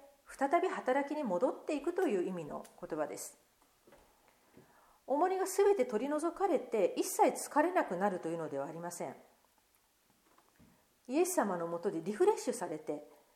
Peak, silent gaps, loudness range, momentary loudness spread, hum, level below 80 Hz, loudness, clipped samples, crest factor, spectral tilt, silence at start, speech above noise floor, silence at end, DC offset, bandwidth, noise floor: -16 dBFS; none; 8 LU; 12 LU; none; -76 dBFS; -34 LUFS; under 0.1%; 18 dB; -4.5 dB/octave; 0 s; 38 dB; 0.3 s; under 0.1%; 16.5 kHz; -72 dBFS